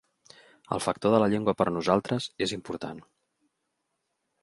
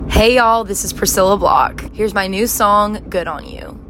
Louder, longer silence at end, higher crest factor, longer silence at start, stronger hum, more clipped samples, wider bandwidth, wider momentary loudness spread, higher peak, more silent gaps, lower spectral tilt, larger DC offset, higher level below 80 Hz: second, -27 LUFS vs -14 LUFS; first, 1.4 s vs 0.05 s; first, 24 dB vs 14 dB; first, 0.7 s vs 0 s; neither; neither; second, 12 kHz vs 16.5 kHz; first, 13 LU vs 10 LU; second, -6 dBFS vs 0 dBFS; neither; first, -5.5 dB/octave vs -3.5 dB/octave; neither; second, -62 dBFS vs -28 dBFS